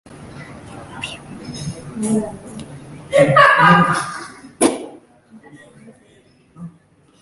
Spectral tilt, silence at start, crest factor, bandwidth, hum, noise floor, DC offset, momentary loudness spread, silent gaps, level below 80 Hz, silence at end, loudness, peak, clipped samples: -4.5 dB/octave; 0.1 s; 20 dB; 11.5 kHz; none; -53 dBFS; under 0.1%; 27 LU; none; -52 dBFS; 0.55 s; -14 LUFS; 0 dBFS; under 0.1%